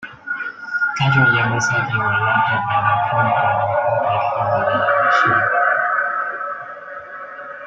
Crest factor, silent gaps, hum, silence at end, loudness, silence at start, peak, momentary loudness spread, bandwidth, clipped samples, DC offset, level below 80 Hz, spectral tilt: 16 dB; none; none; 0 s; -17 LUFS; 0 s; -2 dBFS; 15 LU; 7.8 kHz; under 0.1%; under 0.1%; -54 dBFS; -5 dB/octave